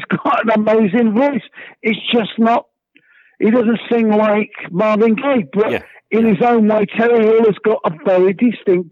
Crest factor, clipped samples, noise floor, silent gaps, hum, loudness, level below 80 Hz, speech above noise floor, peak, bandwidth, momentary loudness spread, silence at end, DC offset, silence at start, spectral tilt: 12 dB; under 0.1%; -53 dBFS; none; none; -15 LUFS; -62 dBFS; 39 dB; -4 dBFS; 5.4 kHz; 6 LU; 0.05 s; under 0.1%; 0 s; -8.5 dB/octave